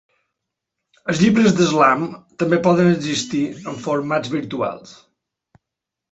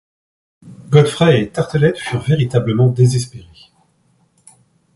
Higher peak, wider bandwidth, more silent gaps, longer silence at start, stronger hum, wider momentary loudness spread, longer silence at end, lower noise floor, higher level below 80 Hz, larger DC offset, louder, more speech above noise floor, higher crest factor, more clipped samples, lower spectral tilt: about the same, -2 dBFS vs 0 dBFS; second, 8.2 kHz vs 11.5 kHz; neither; first, 1.05 s vs 0.65 s; neither; first, 12 LU vs 8 LU; second, 1.2 s vs 1.55 s; first, -84 dBFS vs -58 dBFS; second, -56 dBFS vs -48 dBFS; neither; second, -18 LUFS vs -15 LUFS; first, 66 dB vs 45 dB; about the same, 18 dB vs 16 dB; neither; about the same, -5.5 dB/octave vs -6.5 dB/octave